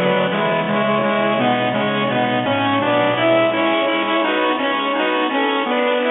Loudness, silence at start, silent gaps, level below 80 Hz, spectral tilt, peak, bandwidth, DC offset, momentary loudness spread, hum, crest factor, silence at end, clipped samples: -17 LUFS; 0 s; none; -72 dBFS; -10 dB/octave; -4 dBFS; 4.1 kHz; under 0.1%; 3 LU; none; 12 dB; 0 s; under 0.1%